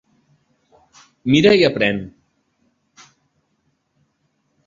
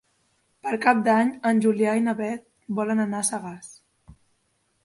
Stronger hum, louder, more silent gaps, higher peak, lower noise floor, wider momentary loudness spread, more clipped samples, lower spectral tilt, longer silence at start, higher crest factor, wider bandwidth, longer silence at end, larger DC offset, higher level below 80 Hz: neither; first, -16 LUFS vs -23 LUFS; neither; first, -2 dBFS vs -6 dBFS; about the same, -68 dBFS vs -70 dBFS; about the same, 16 LU vs 15 LU; neither; about the same, -6 dB/octave vs -5 dB/octave; first, 1.25 s vs 0.65 s; about the same, 20 dB vs 20 dB; second, 7.6 kHz vs 11.5 kHz; first, 2.6 s vs 1.15 s; neither; first, -54 dBFS vs -66 dBFS